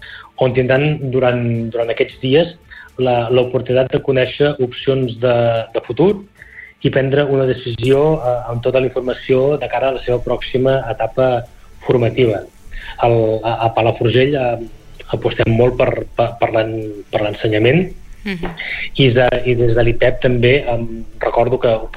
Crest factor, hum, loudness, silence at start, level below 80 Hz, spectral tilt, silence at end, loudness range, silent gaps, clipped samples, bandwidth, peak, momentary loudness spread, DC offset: 14 dB; none; -16 LUFS; 0 s; -34 dBFS; -8 dB/octave; 0 s; 2 LU; none; under 0.1%; 8.6 kHz; -2 dBFS; 9 LU; under 0.1%